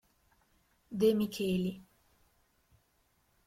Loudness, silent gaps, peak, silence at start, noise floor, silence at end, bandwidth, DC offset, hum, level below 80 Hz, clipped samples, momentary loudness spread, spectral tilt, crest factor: -32 LUFS; none; -16 dBFS; 0.9 s; -73 dBFS; 1.65 s; 16 kHz; under 0.1%; none; -68 dBFS; under 0.1%; 15 LU; -6.5 dB/octave; 20 dB